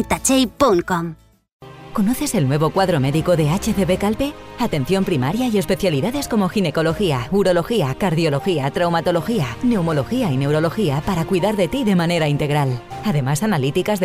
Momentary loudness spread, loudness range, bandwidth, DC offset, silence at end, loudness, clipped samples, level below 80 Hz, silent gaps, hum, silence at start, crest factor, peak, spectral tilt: 5 LU; 1 LU; 16 kHz; under 0.1%; 0 s; -19 LUFS; under 0.1%; -40 dBFS; 1.52-1.60 s; none; 0 s; 14 dB; -6 dBFS; -5.5 dB/octave